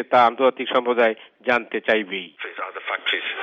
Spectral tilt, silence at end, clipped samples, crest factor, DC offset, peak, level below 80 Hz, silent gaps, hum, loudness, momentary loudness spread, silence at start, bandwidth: -5 dB/octave; 0 s; under 0.1%; 16 dB; under 0.1%; -4 dBFS; -72 dBFS; none; none; -21 LUFS; 13 LU; 0 s; 7.2 kHz